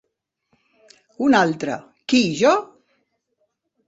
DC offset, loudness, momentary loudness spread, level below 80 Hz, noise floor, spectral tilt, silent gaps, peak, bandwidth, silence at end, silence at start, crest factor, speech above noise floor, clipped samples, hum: under 0.1%; -19 LUFS; 11 LU; -64 dBFS; -75 dBFS; -4.5 dB/octave; none; -2 dBFS; 8 kHz; 1.25 s; 1.2 s; 20 dB; 57 dB; under 0.1%; none